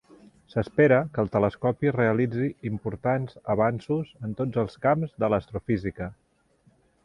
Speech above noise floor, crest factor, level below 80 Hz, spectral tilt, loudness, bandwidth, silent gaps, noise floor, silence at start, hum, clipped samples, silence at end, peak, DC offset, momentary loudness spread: 38 dB; 18 dB; -52 dBFS; -9.5 dB/octave; -26 LUFS; 10.5 kHz; none; -64 dBFS; 0.55 s; none; under 0.1%; 0.9 s; -8 dBFS; under 0.1%; 10 LU